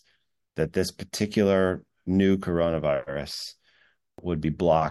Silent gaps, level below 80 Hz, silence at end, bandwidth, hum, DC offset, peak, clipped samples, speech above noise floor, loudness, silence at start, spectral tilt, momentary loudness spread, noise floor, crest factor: none; -50 dBFS; 0 s; 12.5 kHz; none; under 0.1%; -8 dBFS; under 0.1%; 46 dB; -26 LUFS; 0.55 s; -6 dB/octave; 12 LU; -71 dBFS; 18 dB